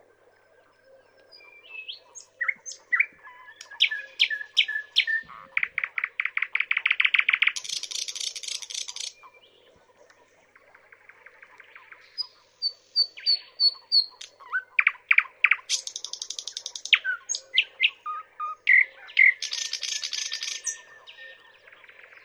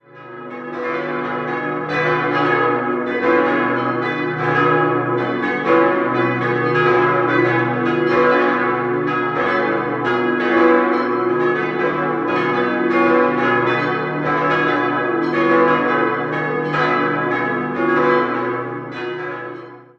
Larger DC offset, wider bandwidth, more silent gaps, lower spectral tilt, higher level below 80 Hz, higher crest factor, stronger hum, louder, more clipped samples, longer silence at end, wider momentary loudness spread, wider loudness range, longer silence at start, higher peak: neither; first, over 20 kHz vs 6.6 kHz; neither; second, 4.5 dB/octave vs -7.5 dB/octave; second, -82 dBFS vs -58 dBFS; first, 24 dB vs 16 dB; neither; second, -24 LUFS vs -17 LUFS; neither; first, 0.9 s vs 0.15 s; first, 17 LU vs 8 LU; first, 12 LU vs 2 LU; first, 1.35 s vs 0.15 s; about the same, -4 dBFS vs -2 dBFS